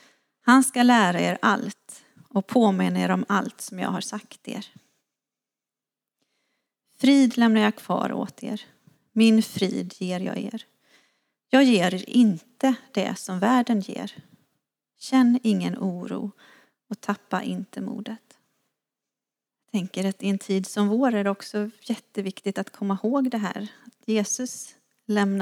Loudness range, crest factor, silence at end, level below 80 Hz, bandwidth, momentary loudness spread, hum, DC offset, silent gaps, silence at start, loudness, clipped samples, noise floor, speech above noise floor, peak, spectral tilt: 10 LU; 22 dB; 0 s; -82 dBFS; 15.5 kHz; 17 LU; none; under 0.1%; none; 0.45 s; -24 LUFS; under 0.1%; -90 dBFS; 67 dB; -2 dBFS; -5 dB/octave